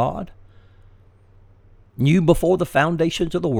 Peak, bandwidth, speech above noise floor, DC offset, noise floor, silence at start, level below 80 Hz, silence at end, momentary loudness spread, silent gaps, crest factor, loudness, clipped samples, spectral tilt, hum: -2 dBFS; 17 kHz; 32 dB; under 0.1%; -50 dBFS; 0 s; -40 dBFS; 0 s; 11 LU; none; 20 dB; -19 LUFS; under 0.1%; -6.5 dB/octave; none